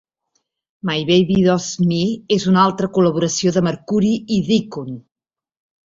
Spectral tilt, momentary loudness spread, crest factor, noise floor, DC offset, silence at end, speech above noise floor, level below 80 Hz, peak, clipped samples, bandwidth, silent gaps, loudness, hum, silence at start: -5.5 dB/octave; 11 LU; 16 dB; -70 dBFS; under 0.1%; 0.85 s; 53 dB; -52 dBFS; -2 dBFS; under 0.1%; 7.8 kHz; none; -17 LUFS; none; 0.85 s